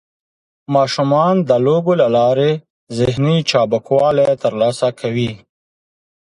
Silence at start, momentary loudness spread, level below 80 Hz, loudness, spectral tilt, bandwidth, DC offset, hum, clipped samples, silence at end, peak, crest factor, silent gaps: 0.7 s; 7 LU; -50 dBFS; -15 LUFS; -6.5 dB/octave; 11.5 kHz; under 0.1%; none; under 0.1%; 1.05 s; 0 dBFS; 16 dB; 2.70-2.87 s